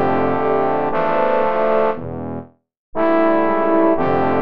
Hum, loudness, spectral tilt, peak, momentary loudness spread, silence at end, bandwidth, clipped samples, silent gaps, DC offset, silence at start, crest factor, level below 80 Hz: none; -17 LUFS; -9 dB/octave; -4 dBFS; 12 LU; 0 s; 5.6 kHz; under 0.1%; 2.77-2.93 s; 5%; 0 s; 14 dB; -46 dBFS